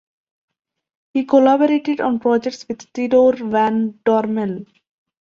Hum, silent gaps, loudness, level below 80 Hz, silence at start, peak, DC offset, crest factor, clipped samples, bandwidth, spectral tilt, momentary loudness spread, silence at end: none; none; -17 LUFS; -62 dBFS; 1.15 s; -2 dBFS; under 0.1%; 16 dB; under 0.1%; 7.4 kHz; -6.5 dB/octave; 12 LU; 0.55 s